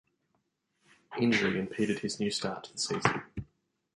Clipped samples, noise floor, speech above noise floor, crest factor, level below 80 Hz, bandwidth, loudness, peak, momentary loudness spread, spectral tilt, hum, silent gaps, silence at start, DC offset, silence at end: under 0.1%; -78 dBFS; 47 dB; 26 dB; -60 dBFS; 11.5 kHz; -31 LUFS; -8 dBFS; 13 LU; -4 dB/octave; none; none; 1.1 s; under 0.1%; 0.5 s